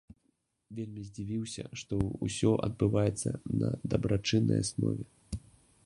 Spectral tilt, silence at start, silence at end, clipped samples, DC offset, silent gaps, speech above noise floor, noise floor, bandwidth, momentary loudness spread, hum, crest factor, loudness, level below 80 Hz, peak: -6 dB/octave; 0.7 s; 0.45 s; under 0.1%; under 0.1%; none; 45 dB; -76 dBFS; 11.5 kHz; 14 LU; none; 20 dB; -32 LUFS; -50 dBFS; -12 dBFS